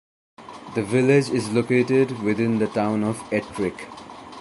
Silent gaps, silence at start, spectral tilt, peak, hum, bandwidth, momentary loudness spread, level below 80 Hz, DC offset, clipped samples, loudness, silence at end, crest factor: none; 0.4 s; -6.5 dB/octave; -4 dBFS; none; 11.5 kHz; 20 LU; -58 dBFS; under 0.1%; under 0.1%; -22 LUFS; 0 s; 18 dB